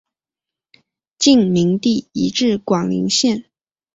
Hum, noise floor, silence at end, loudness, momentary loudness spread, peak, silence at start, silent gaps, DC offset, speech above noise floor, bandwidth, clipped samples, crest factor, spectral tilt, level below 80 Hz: none; -87 dBFS; 0.55 s; -16 LUFS; 6 LU; -2 dBFS; 1.2 s; none; under 0.1%; 71 dB; 8 kHz; under 0.1%; 16 dB; -4.5 dB/octave; -56 dBFS